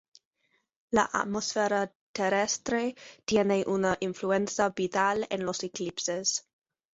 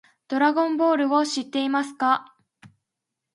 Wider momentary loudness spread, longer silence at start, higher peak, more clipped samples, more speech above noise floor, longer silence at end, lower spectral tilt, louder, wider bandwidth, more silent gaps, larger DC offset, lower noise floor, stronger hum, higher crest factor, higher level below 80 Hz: about the same, 7 LU vs 5 LU; first, 0.9 s vs 0.3 s; about the same, -10 dBFS vs -8 dBFS; neither; second, 46 dB vs 62 dB; about the same, 0.55 s vs 0.65 s; about the same, -3.5 dB/octave vs -3 dB/octave; second, -29 LUFS vs -23 LUFS; second, 8 kHz vs 11.5 kHz; first, 1.95-2.14 s vs none; neither; second, -74 dBFS vs -84 dBFS; neither; about the same, 20 dB vs 18 dB; first, -64 dBFS vs -80 dBFS